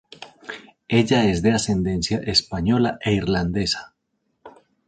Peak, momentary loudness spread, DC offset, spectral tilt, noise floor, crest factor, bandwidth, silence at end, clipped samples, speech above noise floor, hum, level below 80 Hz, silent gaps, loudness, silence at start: -4 dBFS; 18 LU; under 0.1%; -5 dB/octave; -73 dBFS; 18 dB; 9.4 kHz; 0.4 s; under 0.1%; 52 dB; none; -42 dBFS; none; -21 LUFS; 0.2 s